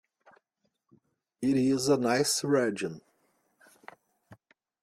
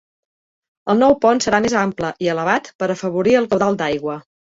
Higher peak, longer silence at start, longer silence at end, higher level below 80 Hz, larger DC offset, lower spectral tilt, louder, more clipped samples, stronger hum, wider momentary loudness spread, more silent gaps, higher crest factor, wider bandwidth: second, -14 dBFS vs -2 dBFS; first, 1.4 s vs 0.85 s; first, 0.5 s vs 0.3 s; second, -70 dBFS vs -52 dBFS; neither; about the same, -4 dB/octave vs -5 dB/octave; second, -27 LUFS vs -18 LUFS; neither; neither; first, 11 LU vs 8 LU; second, none vs 2.75-2.79 s; about the same, 18 dB vs 16 dB; first, 16 kHz vs 8 kHz